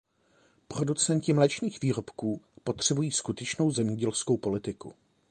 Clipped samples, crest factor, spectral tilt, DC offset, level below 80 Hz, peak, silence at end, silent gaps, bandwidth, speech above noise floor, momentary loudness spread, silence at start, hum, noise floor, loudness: under 0.1%; 22 dB; -4.5 dB/octave; under 0.1%; -62 dBFS; -8 dBFS; 0.4 s; none; 11 kHz; 37 dB; 11 LU; 0.7 s; none; -66 dBFS; -29 LUFS